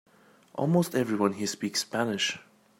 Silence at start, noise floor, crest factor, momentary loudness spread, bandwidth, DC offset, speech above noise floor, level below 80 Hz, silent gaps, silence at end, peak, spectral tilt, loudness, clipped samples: 0.55 s; -57 dBFS; 20 dB; 7 LU; 16 kHz; under 0.1%; 29 dB; -74 dBFS; none; 0.4 s; -10 dBFS; -4.5 dB/octave; -28 LUFS; under 0.1%